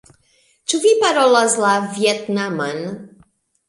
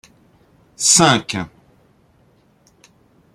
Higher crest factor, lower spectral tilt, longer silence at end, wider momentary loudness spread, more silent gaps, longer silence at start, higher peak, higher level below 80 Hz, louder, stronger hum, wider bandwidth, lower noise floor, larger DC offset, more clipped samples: second, 16 dB vs 22 dB; about the same, -3 dB/octave vs -2.5 dB/octave; second, 0.6 s vs 1.9 s; about the same, 15 LU vs 17 LU; neither; about the same, 0.7 s vs 0.8 s; about the same, -2 dBFS vs 0 dBFS; second, -66 dBFS vs -56 dBFS; second, -17 LUFS vs -14 LUFS; neither; second, 11.5 kHz vs 16 kHz; about the same, -59 dBFS vs -56 dBFS; neither; neither